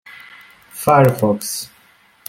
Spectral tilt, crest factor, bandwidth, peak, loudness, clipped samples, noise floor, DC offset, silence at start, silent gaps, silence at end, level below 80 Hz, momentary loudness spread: -5.5 dB/octave; 18 dB; 17 kHz; -2 dBFS; -16 LUFS; under 0.1%; -52 dBFS; under 0.1%; 0.15 s; none; 0.65 s; -54 dBFS; 24 LU